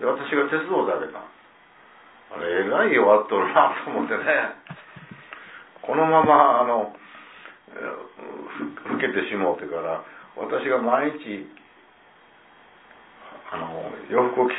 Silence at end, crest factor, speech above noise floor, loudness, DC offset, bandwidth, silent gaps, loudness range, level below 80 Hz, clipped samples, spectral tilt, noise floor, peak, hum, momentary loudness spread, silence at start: 0 s; 22 dB; 31 dB; -22 LUFS; under 0.1%; 4 kHz; none; 7 LU; -70 dBFS; under 0.1%; -9 dB/octave; -54 dBFS; -2 dBFS; none; 24 LU; 0 s